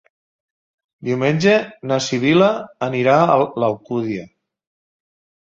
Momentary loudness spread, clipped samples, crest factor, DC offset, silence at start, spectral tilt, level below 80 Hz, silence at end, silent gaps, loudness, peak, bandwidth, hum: 10 LU; under 0.1%; 18 dB; under 0.1%; 1 s; -6 dB/octave; -60 dBFS; 1.15 s; none; -17 LUFS; -2 dBFS; 7.8 kHz; none